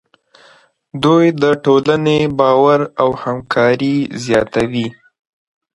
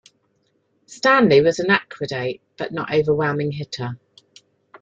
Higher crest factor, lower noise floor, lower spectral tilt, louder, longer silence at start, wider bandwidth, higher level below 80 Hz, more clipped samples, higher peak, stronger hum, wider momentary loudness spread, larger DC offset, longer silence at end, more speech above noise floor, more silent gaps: about the same, 14 dB vs 18 dB; second, -49 dBFS vs -66 dBFS; about the same, -6.5 dB/octave vs -5.5 dB/octave; first, -14 LUFS vs -19 LUFS; about the same, 0.95 s vs 0.9 s; first, 11.5 kHz vs 7.8 kHz; first, -50 dBFS vs -60 dBFS; neither; first, 0 dBFS vs -4 dBFS; neither; second, 8 LU vs 15 LU; neither; about the same, 0.85 s vs 0.85 s; second, 35 dB vs 47 dB; neither